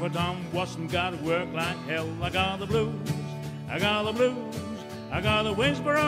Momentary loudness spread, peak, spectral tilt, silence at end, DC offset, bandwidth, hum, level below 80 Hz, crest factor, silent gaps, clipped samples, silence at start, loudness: 10 LU; -12 dBFS; -5.5 dB/octave; 0 s; under 0.1%; 16 kHz; none; -50 dBFS; 16 dB; none; under 0.1%; 0 s; -28 LUFS